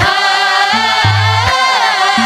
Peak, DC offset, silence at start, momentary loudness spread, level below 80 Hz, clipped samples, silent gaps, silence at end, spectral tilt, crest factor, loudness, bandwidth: 0 dBFS; under 0.1%; 0 s; 0 LU; -36 dBFS; under 0.1%; none; 0 s; -3 dB/octave; 10 dB; -10 LUFS; 15 kHz